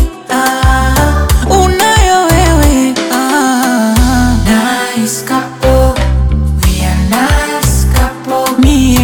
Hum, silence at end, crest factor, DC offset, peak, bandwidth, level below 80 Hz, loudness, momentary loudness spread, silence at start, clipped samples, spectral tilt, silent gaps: none; 0 s; 10 dB; under 0.1%; 0 dBFS; 19.5 kHz; -14 dBFS; -10 LUFS; 5 LU; 0 s; under 0.1%; -5 dB/octave; none